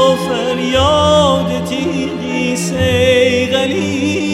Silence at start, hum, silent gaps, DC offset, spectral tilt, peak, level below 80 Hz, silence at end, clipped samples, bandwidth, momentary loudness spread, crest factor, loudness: 0 s; none; none; under 0.1%; -5 dB/octave; 0 dBFS; -38 dBFS; 0 s; under 0.1%; 15 kHz; 7 LU; 12 dB; -14 LUFS